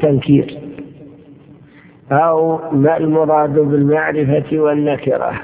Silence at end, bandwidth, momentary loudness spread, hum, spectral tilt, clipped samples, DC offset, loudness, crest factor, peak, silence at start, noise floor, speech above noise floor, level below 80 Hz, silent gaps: 0 s; 4 kHz; 11 LU; none; -12 dB/octave; under 0.1%; under 0.1%; -14 LUFS; 14 dB; 0 dBFS; 0 s; -43 dBFS; 29 dB; -50 dBFS; none